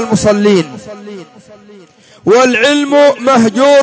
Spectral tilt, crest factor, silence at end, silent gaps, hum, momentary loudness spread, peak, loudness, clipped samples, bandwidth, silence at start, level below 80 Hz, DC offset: -4.5 dB/octave; 10 dB; 0 s; none; none; 21 LU; 0 dBFS; -9 LUFS; under 0.1%; 8 kHz; 0 s; -46 dBFS; under 0.1%